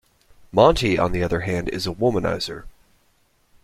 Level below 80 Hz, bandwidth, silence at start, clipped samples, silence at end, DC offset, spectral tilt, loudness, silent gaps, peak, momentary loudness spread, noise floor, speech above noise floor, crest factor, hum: -38 dBFS; 15.5 kHz; 0.55 s; under 0.1%; 0.95 s; under 0.1%; -6 dB/octave; -21 LUFS; none; -2 dBFS; 11 LU; -62 dBFS; 42 dB; 20 dB; none